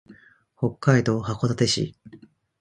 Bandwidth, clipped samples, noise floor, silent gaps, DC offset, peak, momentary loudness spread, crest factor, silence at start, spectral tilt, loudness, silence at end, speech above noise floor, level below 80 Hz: 11 kHz; under 0.1%; -52 dBFS; none; under 0.1%; -2 dBFS; 9 LU; 22 dB; 0.1 s; -5.5 dB/octave; -23 LUFS; 0.45 s; 30 dB; -54 dBFS